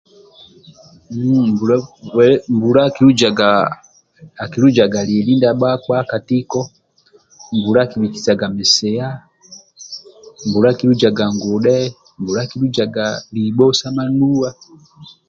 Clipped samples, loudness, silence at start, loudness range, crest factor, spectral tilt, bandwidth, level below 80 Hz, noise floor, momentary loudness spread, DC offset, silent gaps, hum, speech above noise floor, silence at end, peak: under 0.1%; -15 LUFS; 1.1 s; 4 LU; 16 dB; -5.5 dB/octave; 7.8 kHz; -52 dBFS; -53 dBFS; 14 LU; under 0.1%; none; none; 38 dB; 0.25 s; 0 dBFS